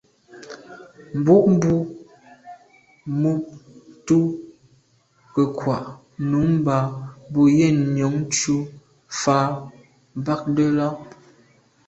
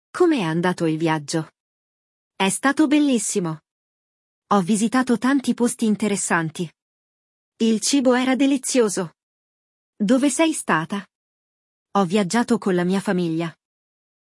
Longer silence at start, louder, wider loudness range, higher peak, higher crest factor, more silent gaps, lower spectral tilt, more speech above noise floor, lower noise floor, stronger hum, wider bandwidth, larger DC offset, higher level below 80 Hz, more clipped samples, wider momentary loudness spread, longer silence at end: first, 0.35 s vs 0.15 s; about the same, -21 LUFS vs -21 LUFS; first, 5 LU vs 2 LU; about the same, -4 dBFS vs -4 dBFS; about the same, 18 dB vs 18 dB; second, none vs 1.60-2.31 s, 3.71-4.42 s, 6.82-7.52 s, 9.23-9.93 s, 11.15-11.86 s; first, -6.5 dB/octave vs -4.5 dB/octave; second, 41 dB vs over 70 dB; second, -60 dBFS vs under -90 dBFS; neither; second, 8.2 kHz vs 12 kHz; neither; first, -54 dBFS vs -72 dBFS; neither; first, 21 LU vs 10 LU; about the same, 0.8 s vs 0.85 s